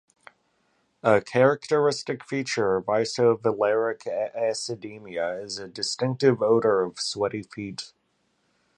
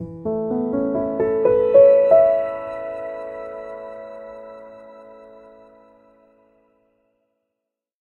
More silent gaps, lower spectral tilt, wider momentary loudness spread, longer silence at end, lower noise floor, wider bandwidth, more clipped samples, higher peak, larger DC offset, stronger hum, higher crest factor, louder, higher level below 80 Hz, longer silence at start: neither; second, -4.5 dB/octave vs -9.5 dB/octave; second, 13 LU vs 25 LU; second, 0.9 s vs 2.85 s; second, -71 dBFS vs -83 dBFS; first, 10.5 kHz vs 4.2 kHz; neither; about the same, -4 dBFS vs -2 dBFS; neither; neither; about the same, 20 dB vs 20 dB; second, -25 LUFS vs -18 LUFS; second, -66 dBFS vs -56 dBFS; first, 1.05 s vs 0 s